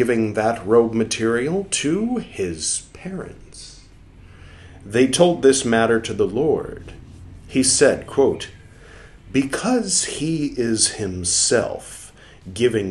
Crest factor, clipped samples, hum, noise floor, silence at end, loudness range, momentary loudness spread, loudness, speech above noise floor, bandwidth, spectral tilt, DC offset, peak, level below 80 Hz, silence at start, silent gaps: 20 dB; under 0.1%; none; -45 dBFS; 0 s; 6 LU; 19 LU; -19 LUFS; 25 dB; 12.5 kHz; -3.5 dB/octave; under 0.1%; -2 dBFS; -48 dBFS; 0 s; none